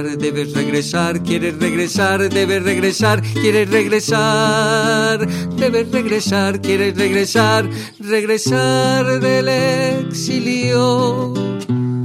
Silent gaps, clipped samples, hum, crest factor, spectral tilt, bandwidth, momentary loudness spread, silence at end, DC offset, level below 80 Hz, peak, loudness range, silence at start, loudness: none; under 0.1%; none; 14 dB; -5 dB/octave; 16 kHz; 6 LU; 0 s; under 0.1%; -52 dBFS; -2 dBFS; 2 LU; 0 s; -16 LUFS